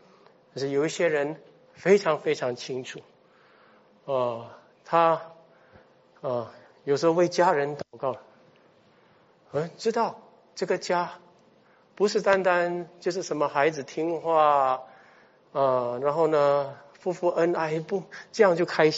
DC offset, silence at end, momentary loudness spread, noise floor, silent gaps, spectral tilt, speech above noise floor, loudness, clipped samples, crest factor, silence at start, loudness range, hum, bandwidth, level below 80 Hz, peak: under 0.1%; 0 s; 14 LU; -60 dBFS; none; -4 dB/octave; 35 dB; -26 LUFS; under 0.1%; 20 dB; 0.55 s; 5 LU; none; 8 kHz; -76 dBFS; -8 dBFS